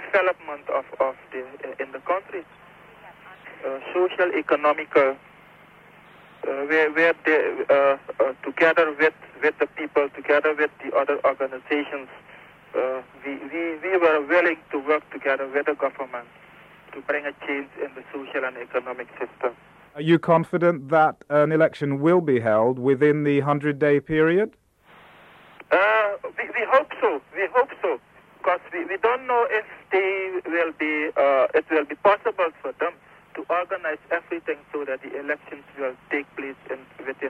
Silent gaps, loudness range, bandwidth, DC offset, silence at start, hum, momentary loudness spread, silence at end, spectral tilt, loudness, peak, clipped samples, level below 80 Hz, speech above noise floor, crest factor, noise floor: none; 9 LU; 9.2 kHz; under 0.1%; 0 s; none; 14 LU; 0 s; -7.5 dB/octave; -23 LUFS; -6 dBFS; under 0.1%; -66 dBFS; 29 dB; 18 dB; -52 dBFS